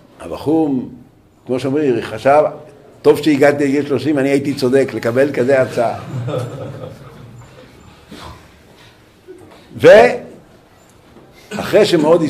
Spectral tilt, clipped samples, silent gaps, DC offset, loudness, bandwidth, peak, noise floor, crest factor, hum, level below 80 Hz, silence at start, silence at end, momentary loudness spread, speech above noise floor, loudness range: -6 dB/octave; under 0.1%; none; under 0.1%; -14 LUFS; 15.5 kHz; 0 dBFS; -46 dBFS; 16 dB; none; -50 dBFS; 0.2 s; 0 s; 20 LU; 33 dB; 11 LU